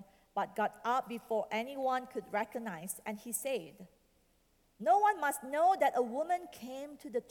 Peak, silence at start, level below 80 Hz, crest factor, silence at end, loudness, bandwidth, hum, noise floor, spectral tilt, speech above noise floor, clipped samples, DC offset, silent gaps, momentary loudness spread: -18 dBFS; 0 s; -76 dBFS; 18 dB; 0.1 s; -34 LUFS; 19 kHz; none; -71 dBFS; -3.5 dB/octave; 37 dB; under 0.1%; under 0.1%; none; 13 LU